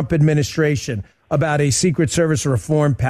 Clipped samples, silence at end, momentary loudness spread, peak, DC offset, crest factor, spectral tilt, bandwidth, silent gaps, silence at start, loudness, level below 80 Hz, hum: under 0.1%; 0 s; 7 LU; -6 dBFS; under 0.1%; 12 dB; -5.5 dB/octave; 13.5 kHz; none; 0 s; -18 LUFS; -42 dBFS; none